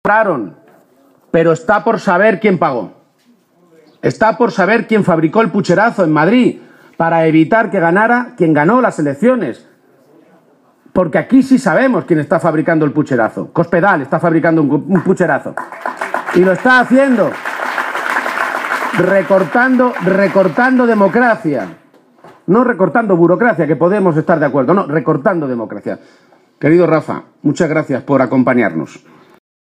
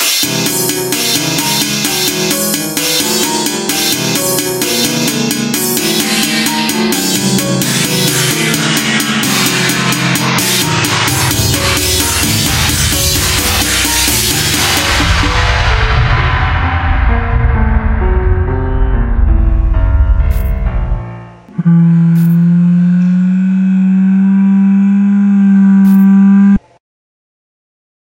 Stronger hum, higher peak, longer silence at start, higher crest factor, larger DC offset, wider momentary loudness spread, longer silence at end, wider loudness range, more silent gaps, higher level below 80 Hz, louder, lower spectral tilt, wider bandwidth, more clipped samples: neither; about the same, 0 dBFS vs 0 dBFS; about the same, 0.05 s vs 0 s; about the same, 12 dB vs 10 dB; neither; first, 9 LU vs 5 LU; second, 0.8 s vs 1.55 s; about the same, 3 LU vs 4 LU; neither; second, -56 dBFS vs -18 dBFS; about the same, -13 LUFS vs -11 LUFS; first, -7.5 dB/octave vs -4 dB/octave; second, 14.5 kHz vs 17.5 kHz; neither